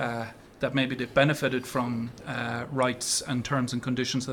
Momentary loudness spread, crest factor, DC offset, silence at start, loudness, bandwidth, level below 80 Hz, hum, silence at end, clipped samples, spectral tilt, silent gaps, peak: 9 LU; 22 dB; under 0.1%; 0 s; -28 LUFS; 18 kHz; -58 dBFS; none; 0 s; under 0.1%; -4.5 dB/octave; none; -6 dBFS